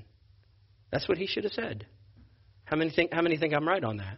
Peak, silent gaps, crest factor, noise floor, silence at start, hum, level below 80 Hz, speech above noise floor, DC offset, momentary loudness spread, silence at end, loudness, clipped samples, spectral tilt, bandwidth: -12 dBFS; none; 20 dB; -61 dBFS; 0 s; none; -60 dBFS; 32 dB; under 0.1%; 9 LU; 0 s; -29 LUFS; under 0.1%; -4 dB/octave; 5.8 kHz